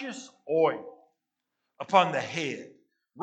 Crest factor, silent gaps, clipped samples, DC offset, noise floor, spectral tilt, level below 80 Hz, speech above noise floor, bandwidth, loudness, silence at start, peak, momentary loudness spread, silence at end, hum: 24 dB; none; under 0.1%; under 0.1%; -84 dBFS; -4.5 dB/octave; -88 dBFS; 56 dB; 8.8 kHz; -27 LUFS; 0 s; -6 dBFS; 19 LU; 0 s; none